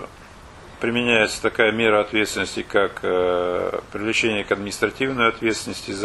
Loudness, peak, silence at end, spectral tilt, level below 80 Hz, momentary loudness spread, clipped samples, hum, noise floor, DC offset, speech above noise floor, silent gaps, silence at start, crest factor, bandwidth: -21 LUFS; -2 dBFS; 0 s; -3.5 dB/octave; -50 dBFS; 9 LU; under 0.1%; none; -43 dBFS; under 0.1%; 22 dB; none; 0 s; 20 dB; 12.5 kHz